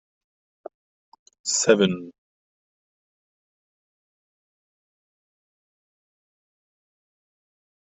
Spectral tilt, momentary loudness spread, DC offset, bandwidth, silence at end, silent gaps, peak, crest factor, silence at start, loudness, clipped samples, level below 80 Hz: -4 dB/octave; 17 LU; under 0.1%; 7.6 kHz; 5.85 s; none; -4 dBFS; 28 dB; 1.45 s; -21 LUFS; under 0.1%; -74 dBFS